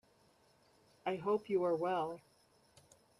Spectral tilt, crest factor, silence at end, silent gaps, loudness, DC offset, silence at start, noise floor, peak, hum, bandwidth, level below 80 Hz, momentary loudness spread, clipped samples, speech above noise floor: -7 dB/octave; 16 dB; 1 s; none; -37 LUFS; under 0.1%; 1.05 s; -70 dBFS; -24 dBFS; none; 12.5 kHz; -82 dBFS; 10 LU; under 0.1%; 34 dB